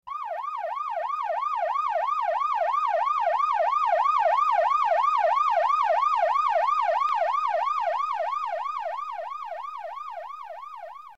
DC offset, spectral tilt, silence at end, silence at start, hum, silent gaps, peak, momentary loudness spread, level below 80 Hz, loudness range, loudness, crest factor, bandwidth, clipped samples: 0.2%; 0 dB/octave; 0.05 s; 0.05 s; none; none; -14 dBFS; 14 LU; -76 dBFS; 7 LU; -25 LUFS; 12 dB; 8.2 kHz; under 0.1%